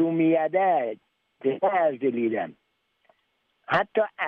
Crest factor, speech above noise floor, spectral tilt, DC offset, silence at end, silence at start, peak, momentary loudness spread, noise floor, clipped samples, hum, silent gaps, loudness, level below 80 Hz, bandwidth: 16 dB; 49 dB; -8.5 dB/octave; under 0.1%; 0 s; 0 s; -10 dBFS; 10 LU; -72 dBFS; under 0.1%; none; none; -25 LUFS; -72 dBFS; 5.4 kHz